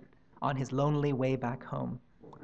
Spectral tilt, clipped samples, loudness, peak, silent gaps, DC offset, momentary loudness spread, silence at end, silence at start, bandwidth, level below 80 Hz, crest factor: -8 dB/octave; under 0.1%; -33 LUFS; -16 dBFS; none; under 0.1%; 9 LU; 0 s; 0.4 s; 8 kHz; -62 dBFS; 16 dB